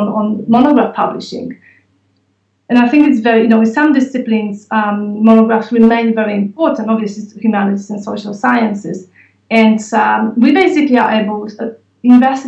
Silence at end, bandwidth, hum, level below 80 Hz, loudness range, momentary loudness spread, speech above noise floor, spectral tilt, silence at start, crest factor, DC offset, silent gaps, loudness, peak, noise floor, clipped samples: 0 s; 8 kHz; none; -58 dBFS; 4 LU; 13 LU; 49 dB; -6.5 dB/octave; 0 s; 12 dB; under 0.1%; none; -12 LUFS; 0 dBFS; -61 dBFS; under 0.1%